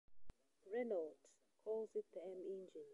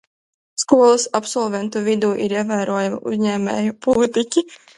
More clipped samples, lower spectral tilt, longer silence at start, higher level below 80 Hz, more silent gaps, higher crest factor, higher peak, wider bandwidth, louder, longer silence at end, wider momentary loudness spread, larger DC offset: neither; first, -6.5 dB/octave vs -4.5 dB/octave; second, 0.1 s vs 0.6 s; second, -76 dBFS vs -58 dBFS; neither; about the same, 16 dB vs 18 dB; second, -34 dBFS vs 0 dBFS; about the same, 11 kHz vs 11.5 kHz; second, -48 LUFS vs -19 LUFS; second, 0 s vs 0.2 s; about the same, 9 LU vs 8 LU; neither